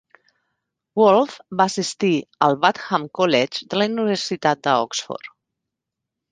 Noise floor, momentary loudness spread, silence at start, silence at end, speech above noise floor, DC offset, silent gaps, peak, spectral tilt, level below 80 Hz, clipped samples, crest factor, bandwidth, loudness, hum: -83 dBFS; 9 LU; 0.95 s; 1.05 s; 63 dB; under 0.1%; none; -2 dBFS; -4.5 dB/octave; -68 dBFS; under 0.1%; 20 dB; 9.8 kHz; -20 LUFS; none